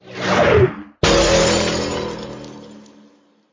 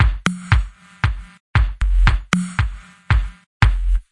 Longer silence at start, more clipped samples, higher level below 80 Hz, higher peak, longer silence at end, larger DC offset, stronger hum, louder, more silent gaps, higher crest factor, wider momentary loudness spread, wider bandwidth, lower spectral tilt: about the same, 0.05 s vs 0 s; neither; second, -34 dBFS vs -20 dBFS; second, -4 dBFS vs 0 dBFS; first, 0.75 s vs 0.1 s; neither; neither; first, -16 LUFS vs -20 LUFS; second, none vs 1.40-1.54 s, 3.46-3.60 s; about the same, 16 dB vs 18 dB; first, 19 LU vs 11 LU; second, 7.8 kHz vs 11 kHz; second, -4 dB/octave vs -5.5 dB/octave